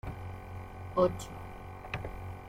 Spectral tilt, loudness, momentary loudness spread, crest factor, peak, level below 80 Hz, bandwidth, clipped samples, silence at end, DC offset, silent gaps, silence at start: -6.5 dB/octave; -36 LUFS; 16 LU; 24 dB; -14 dBFS; -50 dBFS; 16.5 kHz; under 0.1%; 0 s; under 0.1%; none; 0.05 s